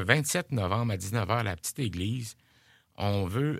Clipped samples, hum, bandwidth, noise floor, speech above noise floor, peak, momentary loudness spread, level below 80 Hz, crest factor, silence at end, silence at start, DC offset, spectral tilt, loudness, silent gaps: under 0.1%; none; 16 kHz; -63 dBFS; 34 dB; -2 dBFS; 7 LU; -56 dBFS; 28 dB; 0 s; 0 s; under 0.1%; -5 dB/octave; -30 LUFS; none